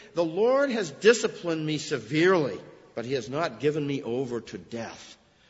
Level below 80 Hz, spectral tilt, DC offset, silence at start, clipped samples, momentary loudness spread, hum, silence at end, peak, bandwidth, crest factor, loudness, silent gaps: -68 dBFS; -5 dB/octave; under 0.1%; 0 s; under 0.1%; 16 LU; none; 0.35 s; -6 dBFS; 8 kHz; 22 dB; -26 LUFS; none